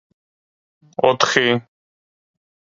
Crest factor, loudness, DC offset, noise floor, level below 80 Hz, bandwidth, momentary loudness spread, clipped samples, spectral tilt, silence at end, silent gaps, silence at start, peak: 22 dB; -17 LUFS; under 0.1%; under -90 dBFS; -62 dBFS; 7.8 kHz; 9 LU; under 0.1%; -3.5 dB/octave; 1.1 s; none; 1 s; 0 dBFS